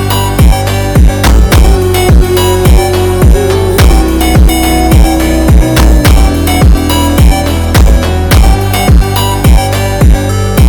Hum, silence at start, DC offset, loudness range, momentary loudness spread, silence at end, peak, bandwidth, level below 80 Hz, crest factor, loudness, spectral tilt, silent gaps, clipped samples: none; 0 s; under 0.1%; 1 LU; 3 LU; 0 s; 0 dBFS; 19.5 kHz; -8 dBFS; 6 dB; -7 LUFS; -5.5 dB/octave; none; 3%